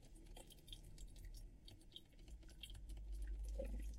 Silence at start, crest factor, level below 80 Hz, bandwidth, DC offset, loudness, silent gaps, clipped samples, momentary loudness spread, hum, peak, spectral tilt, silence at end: 0 s; 16 dB; -52 dBFS; 16 kHz; under 0.1%; -56 LUFS; none; under 0.1%; 12 LU; none; -36 dBFS; -5 dB/octave; 0 s